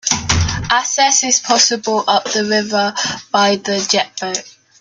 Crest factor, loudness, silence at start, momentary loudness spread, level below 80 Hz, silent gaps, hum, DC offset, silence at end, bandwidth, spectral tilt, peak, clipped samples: 16 dB; -15 LUFS; 0.05 s; 8 LU; -38 dBFS; none; none; under 0.1%; 0.3 s; 11 kHz; -2 dB/octave; 0 dBFS; under 0.1%